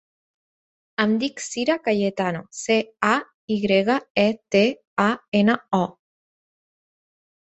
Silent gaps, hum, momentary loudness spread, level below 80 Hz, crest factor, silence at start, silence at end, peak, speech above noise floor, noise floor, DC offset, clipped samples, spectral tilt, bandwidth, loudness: 3.34-3.48 s, 4.10-4.15 s, 4.87-4.97 s, 5.28-5.32 s; none; 7 LU; -62 dBFS; 20 dB; 1 s; 1.5 s; -4 dBFS; over 69 dB; under -90 dBFS; under 0.1%; under 0.1%; -5 dB/octave; 8.2 kHz; -22 LUFS